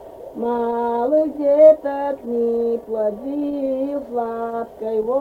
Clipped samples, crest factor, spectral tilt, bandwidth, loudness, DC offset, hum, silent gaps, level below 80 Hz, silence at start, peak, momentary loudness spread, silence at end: under 0.1%; 18 dB; -8 dB/octave; 4.5 kHz; -20 LUFS; under 0.1%; none; none; -56 dBFS; 0 s; -2 dBFS; 13 LU; 0 s